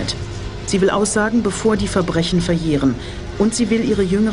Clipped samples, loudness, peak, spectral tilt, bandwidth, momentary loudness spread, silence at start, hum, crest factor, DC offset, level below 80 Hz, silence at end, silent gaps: under 0.1%; -18 LUFS; -4 dBFS; -5 dB/octave; 11 kHz; 10 LU; 0 s; none; 14 dB; 0.6%; -34 dBFS; 0 s; none